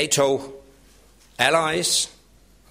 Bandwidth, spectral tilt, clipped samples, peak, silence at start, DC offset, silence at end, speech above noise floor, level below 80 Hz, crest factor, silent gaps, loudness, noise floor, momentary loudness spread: 16 kHz; -2 dB/octave; under 0.1%; -2 dBFS; 0 s; under 0.1%; 0.6 s; 33 dB; -56 dBFS; 22 dB; none; -21 LUFS; -54 dBFS; 10 LU